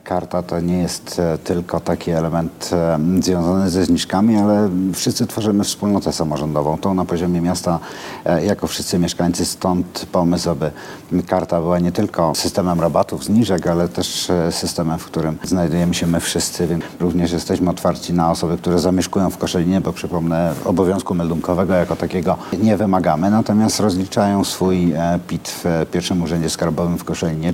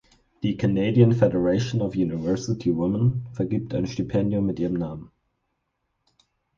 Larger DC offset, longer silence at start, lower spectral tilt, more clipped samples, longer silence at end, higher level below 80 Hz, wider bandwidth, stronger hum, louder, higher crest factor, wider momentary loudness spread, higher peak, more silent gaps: neither; second, 0.05 s vs 0.4 s; second, -5.5 dB/octave vs -8 dB/octave; neither; second, 0 s vs 1.5 s; first, -42 dBFS vs -50 dBFS; first, 16.5 kHz vs 7.4 kHz; neither; first, -18 LUFS vs -24 LUFS; about the same, 16 dB vs 20 dB; second, 5 LU vs 10 LU; about the same, -2 dBFS vs -4 dBFS; neither